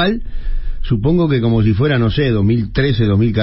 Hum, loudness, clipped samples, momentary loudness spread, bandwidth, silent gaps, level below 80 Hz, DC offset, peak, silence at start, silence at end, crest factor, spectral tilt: none; -15 LUFS; under 0.1%; 14 LU; 5.8 kHz; none; -24 dBFS; under 0.1%; -2 dBFS; 0 s; 0 s; 12 dB; -11.5 dB/octave